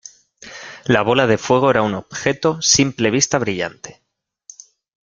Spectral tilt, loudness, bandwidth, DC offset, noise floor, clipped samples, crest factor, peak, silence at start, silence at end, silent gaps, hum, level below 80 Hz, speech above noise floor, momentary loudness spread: -3.5 dB/octave; -17 LUFS; 10.5 kHz; under 0.1%; -48 dBFS; under 0.1%; 18 dB; 0 dBFS; 0.45 s; 1.1 s; none; none; -52 dBFS; 31 dB; 20 LU